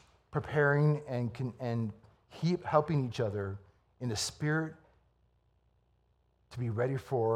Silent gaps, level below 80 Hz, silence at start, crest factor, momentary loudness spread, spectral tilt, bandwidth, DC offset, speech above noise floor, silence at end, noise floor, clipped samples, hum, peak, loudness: none; -66 dBFS; 0.35 s; 22 dB; 12 LU; -6 dB/octave; 13.5 kHz; under 0.1%; 40 dB; 0 s; -72 dBFS; under 0.1%; 60 Hz at -60 dBFS; -12 dBFS; -33 LUFS